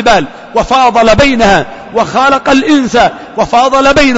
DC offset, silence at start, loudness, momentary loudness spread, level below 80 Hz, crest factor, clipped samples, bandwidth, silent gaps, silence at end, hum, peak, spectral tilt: under 0.1%; 0 s; -8 LUFS; 8 LU; -28 dBFS; 8 dB; 0.1%; 8 kHz; none; 0 s; none; 0 dBFS; -4.5 dB/octave